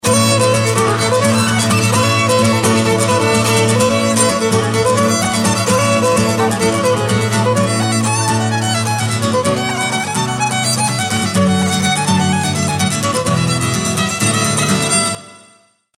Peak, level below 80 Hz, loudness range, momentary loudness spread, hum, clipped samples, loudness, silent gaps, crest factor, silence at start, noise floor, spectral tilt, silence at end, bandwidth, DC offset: 0 dBFS; -46 dBFS; 3 LU; 4 LU; none; under 0.1%; -14 LUFS; none; 14 dB; 0.05 s; -51 dBFS; -4 dB/octave; 0.6 s; 16 kHz; under 0.1%